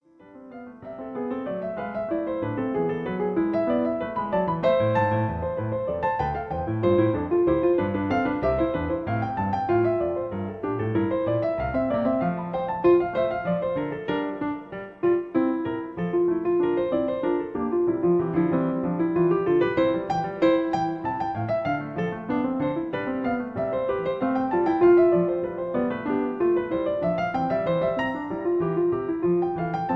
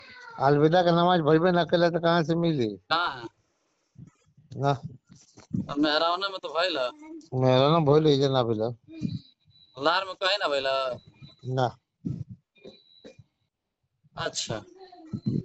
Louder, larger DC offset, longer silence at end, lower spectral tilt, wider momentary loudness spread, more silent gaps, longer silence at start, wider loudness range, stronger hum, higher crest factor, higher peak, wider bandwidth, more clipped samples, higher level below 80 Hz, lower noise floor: about the same, -25 LUFS vs -25 LUFS; neither; about the same, 0 s vs 0 s; first, -9 dB/octave vs -6 dB/octave; second, 8 LU vs 18 LU; neither; first, 0.25 s vs 0.1 s; second, 4 LU vs 12 LU; neither; about the same, 16 dB vs 18 dB; about the same, -8 dBFS vs -10 dBFS; second, 6 kHz vs 8.2 kHz; neither; first, -50 dBFS vs -62 dBFS; second, -47 dBFS vs -80 dBFS